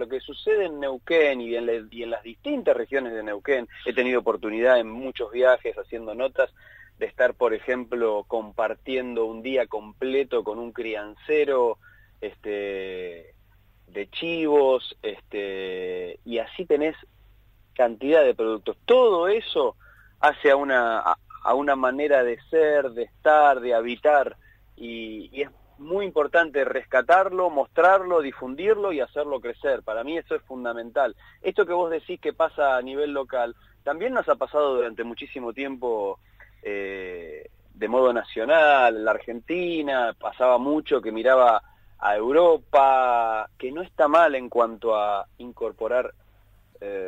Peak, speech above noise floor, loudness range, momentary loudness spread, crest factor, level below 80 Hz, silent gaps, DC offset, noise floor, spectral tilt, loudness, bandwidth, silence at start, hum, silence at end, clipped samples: -6 dBFS; 34 dB; 6 LU; 15 LU; 18 dB; -58 dBFS; none; under 0.1%; -57 dBFS; -5.5 dB/octave; -23 LUFS; 8 kHz; 0 s; none; 0 s; under 0.1%